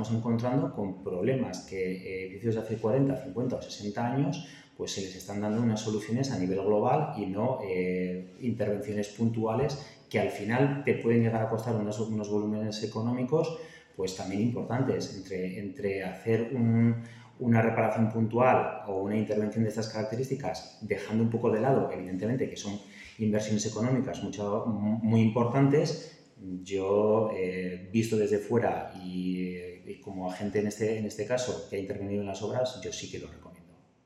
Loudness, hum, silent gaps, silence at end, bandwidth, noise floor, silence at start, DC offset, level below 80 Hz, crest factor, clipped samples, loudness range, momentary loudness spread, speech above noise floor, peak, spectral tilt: -30 LUFS; none; none; 0.45 s; 12.5 kHz; -58 dBFS; 0 s; under 0.1%; -64 dBFS; 20 dB; under 0.1%; 4 LU; 11 LU; 28 dB; -10 dBFS; -6.5 dB/octave